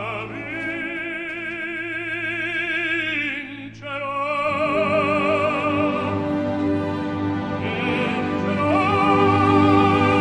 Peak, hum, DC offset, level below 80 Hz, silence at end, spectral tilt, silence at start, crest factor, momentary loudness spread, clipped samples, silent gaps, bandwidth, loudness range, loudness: -4 dBFS; none; under 0.1%; -52 dBFS; 0 s; -7 dB/octave; 0 s; 18 dB; 11 LU; under 0.1%; none; 10 kHz; 5 LU; -21 LUFS